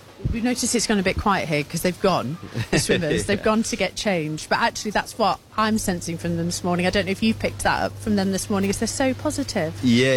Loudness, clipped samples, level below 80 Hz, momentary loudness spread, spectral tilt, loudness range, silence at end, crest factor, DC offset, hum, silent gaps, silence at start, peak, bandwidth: -23 LUFS; under 0.1%; -42 dBFS; 5 LU; -4.5 dB/octave; 1 LU; 0 s; 14 dB; under 0.1%; none; none; 0.05 s; -8 dBFS; 17 kHz